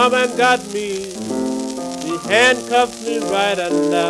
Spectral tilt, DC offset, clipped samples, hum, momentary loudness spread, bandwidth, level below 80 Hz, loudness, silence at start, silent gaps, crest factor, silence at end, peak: -3 dB/octave; under 0.1%; under 0.1%; none; 11 LU; 14 kHz; -56 dBFS; -18 LUFS; 0 s; none; 18 dB; 0 s; 0 dBFS